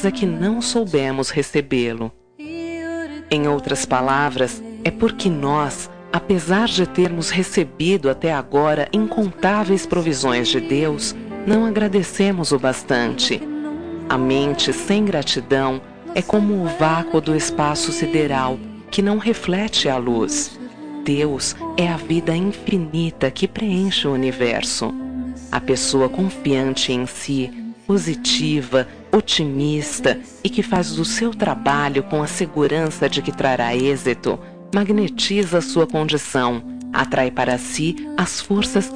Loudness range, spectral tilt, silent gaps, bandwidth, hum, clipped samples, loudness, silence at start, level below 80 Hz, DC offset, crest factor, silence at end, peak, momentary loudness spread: 2 LU; -4.5 dB/octave; none; 10.5 kHz; none; under 0.1%; -20 LUFS; 0 s; -46 dBFS; 0.8%; 16 dB; 0 s; -4 dBFS; 7 LU